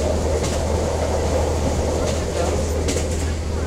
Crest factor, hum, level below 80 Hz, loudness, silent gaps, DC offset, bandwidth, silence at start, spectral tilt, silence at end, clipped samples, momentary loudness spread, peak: 12 dB; none; -26 dBFS; -22 LUFS; none; under 0.1%; 14.5 kHz; 0 s; -5.5 dB/octave; 0 s; under 0.1%; 2 LU; -8 dBFS